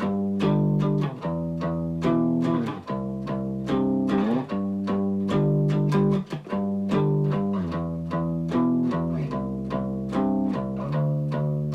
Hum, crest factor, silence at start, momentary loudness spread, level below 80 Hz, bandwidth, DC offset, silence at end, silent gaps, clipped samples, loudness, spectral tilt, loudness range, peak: none; 14 dB; 0 s; 7 LU; -50 dBFS; 7.8 kHz; under 0.1%; 0 s; none; under 0.1%; -25 LUFS; -9 dB/octave; 2 LU; -10 dBFS